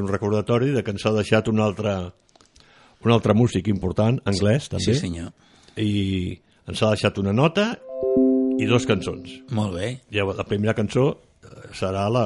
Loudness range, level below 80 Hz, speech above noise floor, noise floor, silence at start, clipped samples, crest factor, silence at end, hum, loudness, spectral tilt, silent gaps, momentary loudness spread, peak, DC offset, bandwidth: 2 LU; -44 dBFS; 32 dB; -54 dBFS; 0 s; under 0.1%; 18 dB; 0 s; none; -22 LUFS; -6.5 dB/octave; none; 11 LU; -4 dBFS; under 0.1%; 11.5 kHz